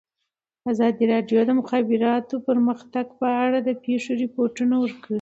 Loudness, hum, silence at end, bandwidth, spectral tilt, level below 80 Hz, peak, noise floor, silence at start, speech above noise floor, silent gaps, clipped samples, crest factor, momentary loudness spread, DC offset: -22 LUFS; none; 0 s; 8 kHz; -6.5 dB/octave; -70 dBFS; -8 dBFS; -81 dBFS; 0.65 s; 60 dB; none; under 0.1%; 14 dB; 6 LU; under 0.1%